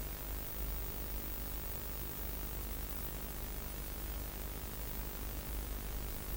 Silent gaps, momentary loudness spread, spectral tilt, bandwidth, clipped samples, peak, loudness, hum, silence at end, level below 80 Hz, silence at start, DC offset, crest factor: none; 2 LU; -4 dB/octave; 17 kHz; under 0.1%; -26 dBFS; -41 LUFS; none; 0 s; -44 dBFS; 0 s; under 0.1%; 16 dB